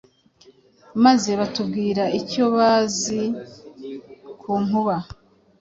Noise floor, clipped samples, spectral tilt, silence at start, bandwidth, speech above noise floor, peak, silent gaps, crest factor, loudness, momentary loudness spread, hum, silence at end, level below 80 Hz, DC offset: -54 dBFS; under 0.1%; -4.5 dB/octave; 0.95 s; 8 kHz; 34 dB; -4 dBFS; none; 18 dB; -21 LUFS; 21 LU; none; 0.45 s; -56 dBFS; under 0.1%